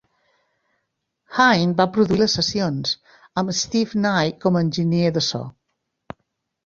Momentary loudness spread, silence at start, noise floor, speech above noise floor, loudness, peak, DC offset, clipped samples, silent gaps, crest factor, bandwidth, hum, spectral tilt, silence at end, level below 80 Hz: 11 LU; 1.3 s; -76 dBFS; 56 dB; -20 LUFS; 0 dBFS; under 0.1%; under 0.1%; none; 20 dB; 7.6 kHz; none; -4.5 dB/octave; 1.15 s; -54 dBFS